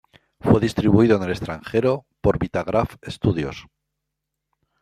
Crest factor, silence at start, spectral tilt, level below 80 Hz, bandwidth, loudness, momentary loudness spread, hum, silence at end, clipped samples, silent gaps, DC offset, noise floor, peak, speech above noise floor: 20 dB; 0.45 s; -8 dB/octave; -44 dBFS; 14 kHz; -21 LUFS; 12 LU; none; 1.2 s; under 0.1%; none; under 0.1%; -81 dBFS; -2 dBFS; 60 dB